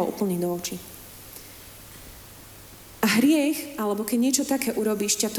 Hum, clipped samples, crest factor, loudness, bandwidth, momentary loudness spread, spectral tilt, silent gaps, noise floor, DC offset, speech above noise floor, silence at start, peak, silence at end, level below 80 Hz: none; under 0.1%; 20 dB; -24 LUFS; over 20 kHz; 23 LU; -3.5 dB/octave; none; -46 dBFS; under 0.1%; 22 dB; 0 s; -6 dBFS; 0 s; -56 dBFS